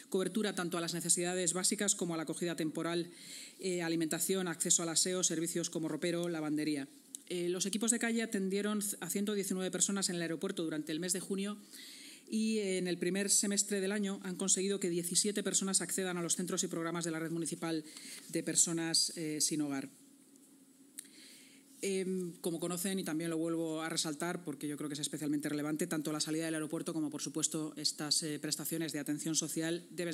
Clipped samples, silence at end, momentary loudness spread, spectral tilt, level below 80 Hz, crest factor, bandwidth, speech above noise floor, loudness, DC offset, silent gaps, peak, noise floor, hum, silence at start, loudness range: under 0.1%; 0 s; 10 LU; -3 dB/octave; under -90 dBFS; 24 dB; 16 kHz; 26 dB; -35 LUFS; under 0.1%; none; -12 dBFS; -62 dBFS; none; 0 s; 4 LU